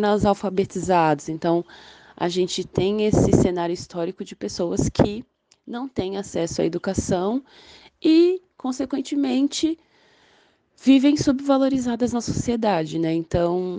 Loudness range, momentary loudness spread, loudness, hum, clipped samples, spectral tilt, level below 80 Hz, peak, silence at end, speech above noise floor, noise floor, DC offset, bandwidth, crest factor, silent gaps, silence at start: 4 LU; 11 LU; -22 LUFS; none; under 0.1%; -6 dB/octave; -44 dBFS; -2 dBFS; 0 s; 38 dB; -60 dBFS; under 0.1%; 9.8 kHz; 20 dB; none; 0 s